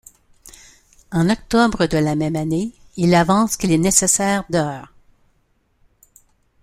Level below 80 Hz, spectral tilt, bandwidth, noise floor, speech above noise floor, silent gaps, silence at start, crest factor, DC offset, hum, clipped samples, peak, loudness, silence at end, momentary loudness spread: -44 dBFS; -4.5 dB/octave; 16 kHz; -63 dBFS; 46 dB; none; 1.1 s; 20 dB; under 0.1%; none; under 0.1%; 0 dBFS; -18 LUFS; 1.8 s; 10 LU